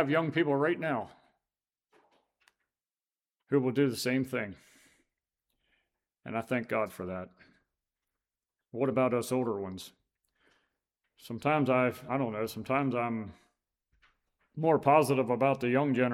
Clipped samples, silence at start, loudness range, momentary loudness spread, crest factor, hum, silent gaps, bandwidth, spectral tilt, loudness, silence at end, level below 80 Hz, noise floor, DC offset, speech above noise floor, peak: under 0.1%; 0 s; 8 LU; 15 LU; 22 dB; none; none; 16 kHz; -6.5 dB/octave; -30 LUFS; 0 s; -72 dBFS; under -90 dBFS; under 0.1%; over 60 dB; -10 dBFS